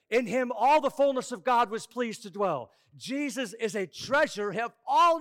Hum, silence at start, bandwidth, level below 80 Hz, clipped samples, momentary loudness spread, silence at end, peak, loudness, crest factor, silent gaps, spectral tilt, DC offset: none; 0.1 s; 16.5 kHz; -68 dBFS; under 0.1%; 10 LU; 0 s; -16 dBFS; -28 LUFS; 12 dB; none; -4 dB/octave; under 0.1%